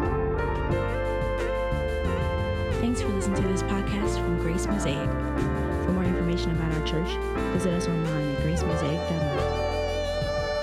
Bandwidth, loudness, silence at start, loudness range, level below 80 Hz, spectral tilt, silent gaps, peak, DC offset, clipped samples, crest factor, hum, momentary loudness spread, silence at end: 14 kHz; -27 LUFS; 0 s; 1 LU; -34 dBFS; -6.5 dB/octave; none; -12 dBFS; under 0.1%; under 0.1%; 14 dB; none; 2 LU; 0 s